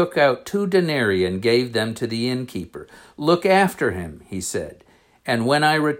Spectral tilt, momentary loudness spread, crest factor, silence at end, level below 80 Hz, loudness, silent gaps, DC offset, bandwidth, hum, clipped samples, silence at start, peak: -5 dB/octave; 15 LU; 16 dB; 0 s; -58 dBFS; -20 LUFS; none; under 0.1%; 16.5 kHz; none; under 0.1%; 0 s; -4 dBFS